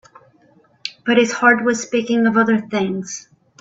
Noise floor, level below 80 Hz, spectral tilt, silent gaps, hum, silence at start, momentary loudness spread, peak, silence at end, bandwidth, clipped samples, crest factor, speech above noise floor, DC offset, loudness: -54 dBFS; -62 dBFS; -4 dB/octave; none; none; 0.85 s; 17 LU; 0 dBFS; 0.4 s; 8 kHz; under 0.1%; 18 dB; 38 dB; under 0.1%; -17 LUFS